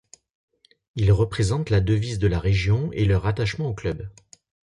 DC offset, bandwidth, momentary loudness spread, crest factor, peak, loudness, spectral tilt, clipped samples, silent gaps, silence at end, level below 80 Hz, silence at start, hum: under 0.1%; 11 kHz; 9 LU; 16 dB; -8 dBFS; -23 LUFS; -7 dB/octave; under 0.1%; none; 0.65 s; -36 dBFS; 0.95 s; none